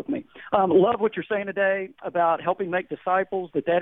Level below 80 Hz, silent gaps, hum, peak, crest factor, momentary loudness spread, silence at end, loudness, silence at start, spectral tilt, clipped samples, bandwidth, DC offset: -64 dBFS; none; none; -6 dBFS; 18 dB; 9 LU; 0 s; -24 LUFS; 0.1 s; -9.5 dB/octave; under 0.1%; 3.9 kHz; under 0.1%